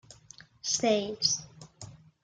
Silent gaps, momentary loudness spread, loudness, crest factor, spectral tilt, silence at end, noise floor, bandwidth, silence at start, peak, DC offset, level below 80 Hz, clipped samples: none; 23 LU; -28 LUFS; 22 dB; -2 dB/octave; 0.3 s; -55 dBFS; 11 kHz; 0.1 s; -12 dBFS; under 0.1%; -68 dBFS; under 0.1%